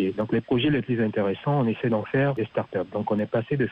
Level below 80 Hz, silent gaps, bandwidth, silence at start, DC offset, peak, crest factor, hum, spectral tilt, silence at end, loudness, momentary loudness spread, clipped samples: -56 dBFS; none; 5.2 kHz; 0 s; under 0.1%; -12 dBFS; 12 dB; none; -9.5 dB/octave; 0 s; -25 LUFS; 5 LU; under 0.1%